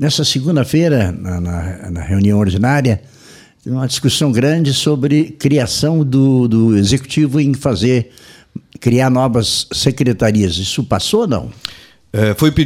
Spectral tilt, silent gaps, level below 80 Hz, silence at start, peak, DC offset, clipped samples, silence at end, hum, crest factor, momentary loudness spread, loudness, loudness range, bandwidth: -5.5 dB/octave; none; -38 dBFS; 0 s; 0 dBFS; under 0.1%; under 0.1%; 0 s; none; 14 dB; 11 LU; -14 LUFS; 3 LU; 16 kHz